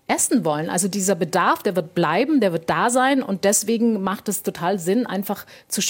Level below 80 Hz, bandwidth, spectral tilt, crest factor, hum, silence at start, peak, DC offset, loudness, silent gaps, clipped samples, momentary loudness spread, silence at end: -66 dBFS; 17 kHz; -4 dB/octave; 16 dB; none; 0.1 s; -4 dBFS; under 0.1%; -20 LUFS; none; under 0.1%; 7 LU; 0 s